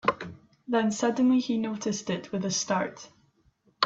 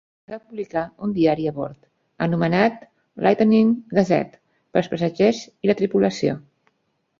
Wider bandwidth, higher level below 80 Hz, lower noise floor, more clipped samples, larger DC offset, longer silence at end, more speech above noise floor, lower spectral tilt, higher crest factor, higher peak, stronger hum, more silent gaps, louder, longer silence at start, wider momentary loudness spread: about the same, 8 kHz vs 7.4 kHz; second, -68 dBFS vs -58 dBFS; about the same, -67 dBFS vs -70 dBFS; neither; neither; second, 0 s vs 0.8 s; second, 39 dB vs 50 dB; second, -4 dB/octave vs -7 dB/octave; about the same, 22 dB vs 18 dB; second, -6 dBFS vs -2 dBFS; neither; neither; second, -28 LUFS vs -21 LUFS; second, 0.05 s vs 0.3 s; about the same, 16 LU vs 15 LU